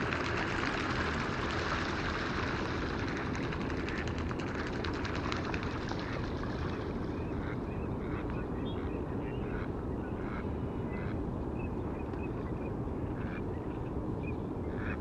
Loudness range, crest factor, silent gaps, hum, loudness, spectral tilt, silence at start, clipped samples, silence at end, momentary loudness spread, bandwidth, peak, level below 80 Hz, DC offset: 4 LU; 20 dB; none; none; -36 LUFS; -6.5 dB/octave; 0 s; under 0.1%; 0 s; 5 LU; 9.4 kHz; -16 dBFS; -44 dBFS; under 0.1%